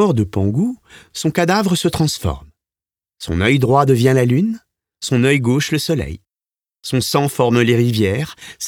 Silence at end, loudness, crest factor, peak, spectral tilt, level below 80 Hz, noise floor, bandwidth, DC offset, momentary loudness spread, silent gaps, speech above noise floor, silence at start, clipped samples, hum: 0 s; -16 LUFS; 16 dB; 0 dBFS; -5.5 dB/octave; -40 dBFS; under -90 dBFS; 18.5 kHz; under 0.1%; 16 LU; none; over 74 dB; 0 s; under 0.1%; none